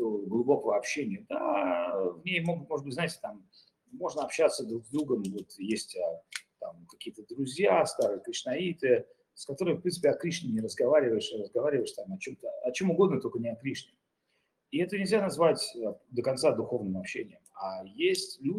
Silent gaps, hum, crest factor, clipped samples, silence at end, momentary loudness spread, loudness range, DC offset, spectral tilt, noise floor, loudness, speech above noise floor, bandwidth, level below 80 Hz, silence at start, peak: none; none; 20 dB; under 0.1%; 0 s; 14 LU; 4 LU; under 0.1%; -5 dB/octave; -77 dBFS; -31 LUFS; 47 dB; 15 kHz; -76 dBFS; 0 s; -12 dBFS